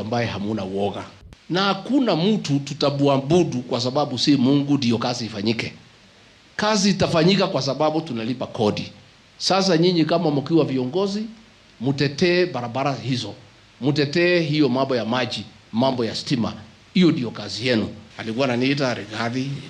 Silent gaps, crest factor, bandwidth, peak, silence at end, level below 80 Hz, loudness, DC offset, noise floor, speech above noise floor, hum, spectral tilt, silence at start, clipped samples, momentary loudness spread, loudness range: none; 14 dB; 10.5 kHz; -8 dBFS; 0 s; -58 dBFS; -21 LUFS; under 0.1%; -51 dBFS; 30 dB; none; -5.5 dB/octave; 0 s; under 0.1%; 10 LU; 2 LU